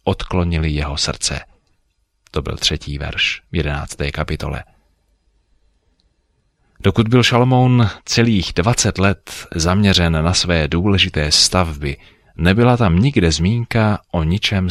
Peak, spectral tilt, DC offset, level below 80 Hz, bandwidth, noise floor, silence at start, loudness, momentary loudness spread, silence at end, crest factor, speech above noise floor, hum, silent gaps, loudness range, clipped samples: 0 dBFS; -4.5 dB/octave; under 0.1%; -30 dBFS; 14 kHz; -64 dBFS; 0.05 s; -16 LUFS; 12 LU; 0 s; 16 dB; 48 dB; none; none; 8 LU; under 0.1%